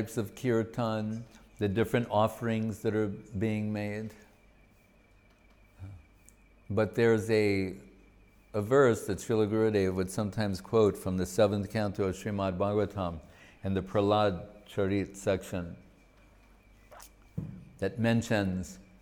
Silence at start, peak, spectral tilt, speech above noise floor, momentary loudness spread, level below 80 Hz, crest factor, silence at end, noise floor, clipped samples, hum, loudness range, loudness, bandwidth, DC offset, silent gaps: 0 s; -12 dBFS; -6.5 dB/octave; 32 dB; 15 LU; -58 dBFS; 20 dB; 0.2 s; -62 dBFS; under 0.1%; none; 8 LU; -30 LUFS; 19 kHz; under 0.1%; none